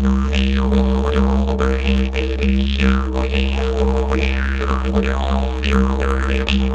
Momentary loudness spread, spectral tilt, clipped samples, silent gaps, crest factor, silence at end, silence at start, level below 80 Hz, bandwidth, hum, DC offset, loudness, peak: 3 LU; -7 dB/octave; under 0.1%; none; 14 dB; 0 s; 0 s; -18 dBFS; 7.8 kHz; none; under 0.1%; -18 LUFS; -2 dBFS